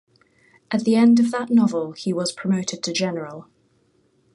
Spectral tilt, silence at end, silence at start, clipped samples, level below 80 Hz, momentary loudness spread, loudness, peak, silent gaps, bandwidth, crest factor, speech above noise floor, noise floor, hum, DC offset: -5 dB/octave; 0.95 s; 0.7 s; under 0.1%; -68 dBFS; 12 LU; -21 LUFS; -8 dBFS; none; 11 kHz; 14 dB; 43 dB; -63 dBFS; none; under 0.1%